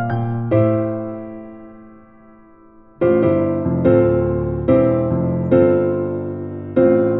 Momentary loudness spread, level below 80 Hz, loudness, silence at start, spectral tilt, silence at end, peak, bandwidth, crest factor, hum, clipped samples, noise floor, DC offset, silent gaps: 13 LU; -42 dBFS; -17 LUFS; 0 s; -13 dB/octave; 0 s; -2 dBFS; 4 kHz; 16 dB; none; under 0.1%; -46 dBFS; under 0.1%; none